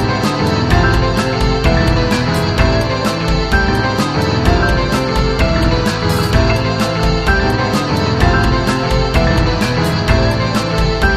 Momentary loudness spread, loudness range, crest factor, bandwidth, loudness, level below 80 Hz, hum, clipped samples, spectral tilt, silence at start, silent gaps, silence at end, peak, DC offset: 2 LU; 0 LU; 12 dB; 15.5 kHz; -14 LUFS; -20 dBFS; none; under 0.1%; -5.5 dB/octave; 0 s; none; 0 s; 0 dBFS; under 0.1%